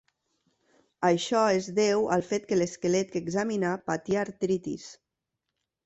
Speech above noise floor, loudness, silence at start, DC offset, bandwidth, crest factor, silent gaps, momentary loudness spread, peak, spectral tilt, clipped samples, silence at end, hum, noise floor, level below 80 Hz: 58 dB; -27 LUFS; 1 s; under 0.1%; 8.2 kHz; 18 dB; none; 7 LU; -12 dBFS; -5 dB/octave; under 0.1%; 0.9 s; none; -85 dBFS; -66 dBFS